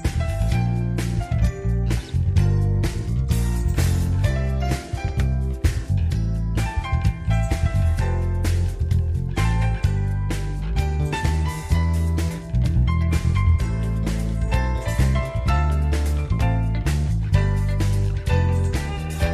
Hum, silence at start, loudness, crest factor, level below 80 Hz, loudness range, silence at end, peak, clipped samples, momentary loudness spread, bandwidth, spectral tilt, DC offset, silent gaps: none; 0 s; -23 LUFS; 16 dB; -24 dBFS; 1 LU; 0 s; -4 dBFS; under 0.1%; 4 LU; 14 kHz; -6.5 dB/octave; under 0.1%; none